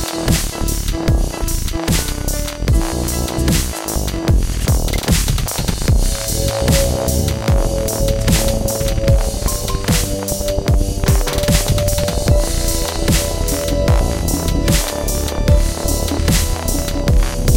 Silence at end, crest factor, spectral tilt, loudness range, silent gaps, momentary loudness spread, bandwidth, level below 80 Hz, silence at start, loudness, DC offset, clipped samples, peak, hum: 0 s; 16 dB; -4.5 dB/octave; 2 LU; none; 4 LU; 17 kHz; -18 dBFS; 0 s; -17 LUFS; under 0.1%; under 0.1%; 0 dBFS; none